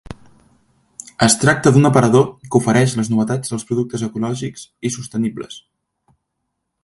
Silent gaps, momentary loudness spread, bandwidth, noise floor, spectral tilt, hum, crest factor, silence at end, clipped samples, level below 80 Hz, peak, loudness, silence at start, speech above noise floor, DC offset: none; 17 LU; 12 kHz; -75 dBFS; -5 dB/octave; none; 18 dB; 1.25 s; under 0.1%; -50 dBFS; 0 dBFS; -17 LUFS; 0.1 s; 59 dB; under 0.1%